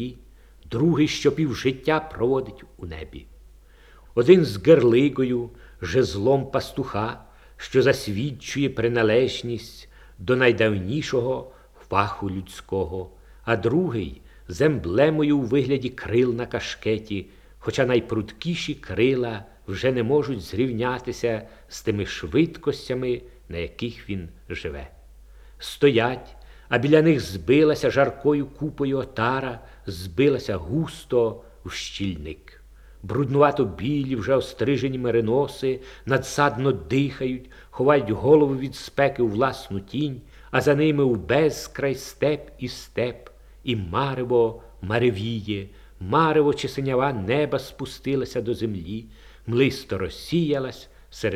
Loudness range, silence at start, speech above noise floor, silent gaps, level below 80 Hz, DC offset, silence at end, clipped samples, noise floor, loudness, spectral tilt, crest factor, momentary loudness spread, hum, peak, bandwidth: 5 LU; 0 s; 27 dB; none; -48 dBFS; under 0.1%; 0 s; under 0.1%; -50 dBFS; -23 LUFS; -6.5 dB/octave; 22 dB; 16 LU; none; -2 dBFS; 15 kHz